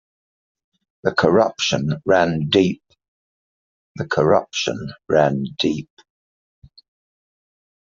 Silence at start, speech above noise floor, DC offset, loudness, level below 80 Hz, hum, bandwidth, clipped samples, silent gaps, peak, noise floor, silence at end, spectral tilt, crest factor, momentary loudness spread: 1.05 s; over 71 dB; under 0.1%; -19 LUFS; -56 dBFS; none; 7.6 kHz; under 0.1%; 3.08-3.95 s; 0 dBFS; under -90 dBFS; 2.1 s; -4 dB/octave; 22 dB; 9 LU